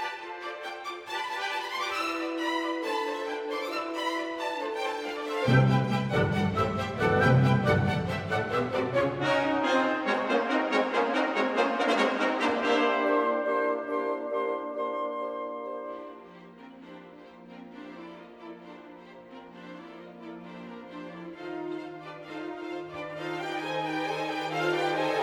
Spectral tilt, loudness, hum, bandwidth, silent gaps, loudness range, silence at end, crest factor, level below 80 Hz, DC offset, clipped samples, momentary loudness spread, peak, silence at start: -6 dB/octave; -28 LUFS; none; 15 kHz; none; 19 LU; 0 s; 20 dB; -58 dBFS; under 0.1%; under 0.1%; 21 LU; -10 dBFS; 0 s